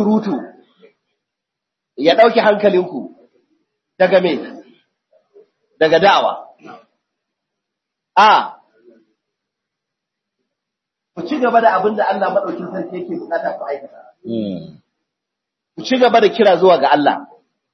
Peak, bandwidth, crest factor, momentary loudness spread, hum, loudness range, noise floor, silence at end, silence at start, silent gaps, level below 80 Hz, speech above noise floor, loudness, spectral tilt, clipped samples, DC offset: 0 dBFS; 6.4 kHz; 18 dB; 18 LU; none; 6 LU; -81 dBFS; 0.5 s; 0 s; none; -68 dBFS; 67 dB; -15 LUFS; -5.5 dB/octave; under 0.1%; under 0.1%